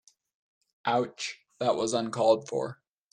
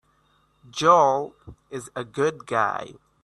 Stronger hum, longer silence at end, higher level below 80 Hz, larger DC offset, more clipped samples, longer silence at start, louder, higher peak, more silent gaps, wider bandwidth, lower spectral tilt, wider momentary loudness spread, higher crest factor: neither; about the same, 0.4 s vs 0.3 s; second, -76 dBFS vs -62 dBFS; neither; neither; about the same, 0.85 s vs 0.75 s; second, -29 LUFS vs -22 LUFS; second, -10 dBFS vs -4 dBFS; neither; about the same, 11 kHz vs 12 kHz; about the same, -4 dB/octave vs -4.5 dB/octave; second, 12 LU vs 20 LU; about the same, 20 dB vs 20 dB